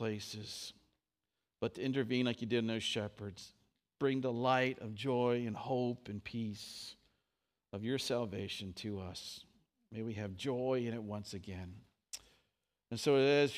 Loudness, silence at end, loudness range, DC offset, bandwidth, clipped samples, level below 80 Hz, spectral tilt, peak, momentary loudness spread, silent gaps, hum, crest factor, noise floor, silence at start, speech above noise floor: -37 LUFS; 0 s; 6 LU; under 0.1%; 15.5 kHz; under 0.1%; -74 dBFS; -5.5 dB/octave; -18 dBFS; 16 LU; none; none; 20 dB; under -90 dBFS; 0 s; over 53 dB